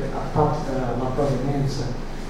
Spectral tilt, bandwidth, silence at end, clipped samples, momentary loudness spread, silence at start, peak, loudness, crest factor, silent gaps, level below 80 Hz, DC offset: -7 dB/octave; 11.5 kHz; 0 s; under 0.1%; 5 LU; 0 s; -4 dBFS; -24 LUFS; 18 dB; none; -30 dBFS; under 0.1%